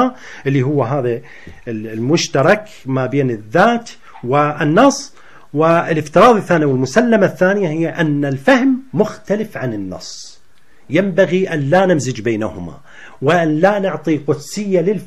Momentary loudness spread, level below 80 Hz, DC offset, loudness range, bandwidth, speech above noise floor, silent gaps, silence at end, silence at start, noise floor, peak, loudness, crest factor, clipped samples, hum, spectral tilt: 13 LU; -52 dBFS; 1%; 4 LU; 13.5 kHz; 39 dB; none; 0 s; 0 s; -54 dBFS; 0 dBFS; -15 LUFS; 16 dB; under 0.1%; none; -6 dB/octave